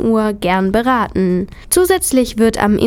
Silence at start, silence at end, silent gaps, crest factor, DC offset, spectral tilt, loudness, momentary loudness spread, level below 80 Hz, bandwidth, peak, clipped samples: 0 s; 0 s; none; 14 dB; under 0.1%; -5 dB/octave; -14 LUFS; 4 LU; -34 dBFS; 19 kHz; 0 dBFS; under 0.1%